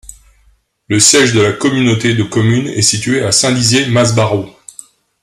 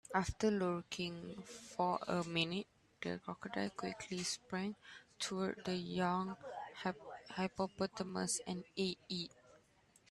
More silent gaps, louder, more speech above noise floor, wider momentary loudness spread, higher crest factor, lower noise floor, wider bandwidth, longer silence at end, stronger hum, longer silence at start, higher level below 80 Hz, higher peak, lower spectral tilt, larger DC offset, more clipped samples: neither; first, -11 LUFS vs -41 LUFS; first, 42 dB vs 30 dB; second, 7 LU vs 12 LU; second, 12 dB vs 22 dB; second, -53 dBFS vs -70 dBFS; about the same, 13.5 kHz vs 12.5 kHz; first, 0.75 s vs 0.55 s; neither; about the same, 0.1 s vs 0.1 s; first, -46 dBFS vs -64 dBFS; first, 0 dBFS vs -20 dBFS; about the same, -3.5 dB/octave vs -4 dB/octave; neither; neither